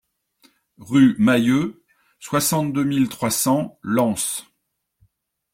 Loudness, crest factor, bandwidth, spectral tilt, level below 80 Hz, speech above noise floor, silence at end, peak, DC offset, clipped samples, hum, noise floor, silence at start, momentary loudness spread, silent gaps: -20 LUFS; 16 dB; 16.5 kHz; -4.5 dB/octave; -58 dBFS; 56 dB; 1.1 s; -4 dBFS; under 0.1%; under 0.1%; none; -75 dBFS; 0.8 s; 9 LU; none